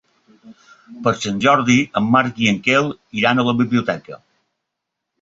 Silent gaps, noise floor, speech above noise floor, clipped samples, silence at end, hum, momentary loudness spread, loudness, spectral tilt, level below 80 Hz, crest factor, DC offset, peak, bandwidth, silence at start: none; -79 dBFS; 62 dB; under 0.1%; 1.05 s; none; 8 LU; -17 LUFS; -5 dB/octave; -56 dBFS; 18 dB; under 0.1%; -2 dBFS; 7.8 kHz; 0.45 s